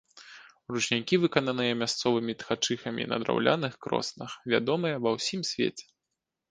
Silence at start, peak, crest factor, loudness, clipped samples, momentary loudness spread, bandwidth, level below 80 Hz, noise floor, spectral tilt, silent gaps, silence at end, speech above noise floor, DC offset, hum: 0.15 s; -4 dBFS; 26 dB; -29 LUFS; under 0.1%; 12 LU; 10 kHz; -68 dBFS; -86 dBFS; -4 dB/octave; none; 0.7 s; 57 dB; under 0.1%; none